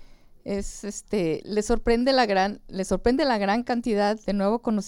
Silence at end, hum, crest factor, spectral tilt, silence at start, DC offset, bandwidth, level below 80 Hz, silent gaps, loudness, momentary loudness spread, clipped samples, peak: 0 s; none; 16 dB; -5 dB/octave; 0 s; under 0.1%; 16 kHz; -40 dBFS; none; -25 LUFS; 11 LU; under 0.1%; -8 dBFS